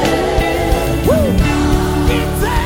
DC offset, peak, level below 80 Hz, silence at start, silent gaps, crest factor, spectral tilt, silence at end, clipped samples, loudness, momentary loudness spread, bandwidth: under 0.1%; -2 dBFS; -20 dBFS; 0 s; none; 12 dB; -6 dB/octave; 0 s; under 0.1%; -15 LUFS; 2 LU; 17 kHz